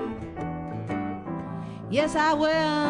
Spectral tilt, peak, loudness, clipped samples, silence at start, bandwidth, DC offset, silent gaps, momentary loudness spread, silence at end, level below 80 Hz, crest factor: -5.5 dB/octave; -10 dBFS; -27 LUFS; under 0.1%; 0 s; 10.5 kHz; under 0.1%; none; 12 LU; 0 s; -52 dBFS; 18 dB